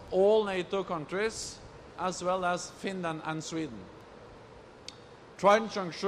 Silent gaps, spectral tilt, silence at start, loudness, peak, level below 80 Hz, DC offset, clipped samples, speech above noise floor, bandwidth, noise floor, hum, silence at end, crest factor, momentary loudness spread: none; -4.5 dB/octave; 0 s; -31 LUFS; -10 dBFS; -62 dBFS; under 0.1%; under 0.1%; 22 dB; 13 kHz; -51 dBFS; none; 0 s; 20 dB; 26 LU